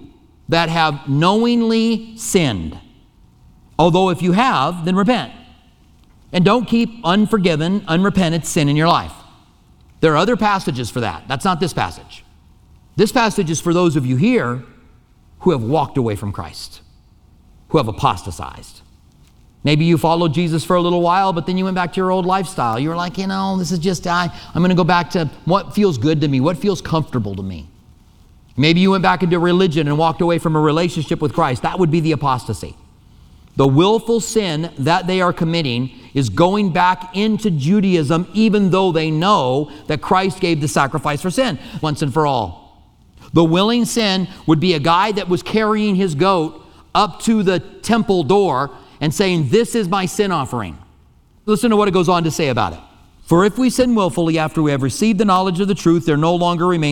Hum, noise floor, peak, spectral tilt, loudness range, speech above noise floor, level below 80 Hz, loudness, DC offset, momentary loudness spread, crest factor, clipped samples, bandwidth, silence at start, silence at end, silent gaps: none; -50 dBFS; 0 dBFS; -6 dB/octave; 4 LU; 34 dB; -44 dBFS; -17 LUFS; under 0.1%; 8 LU; 16 dB; under 0.1%; 16.5 kHz; 0 s; 0 s; none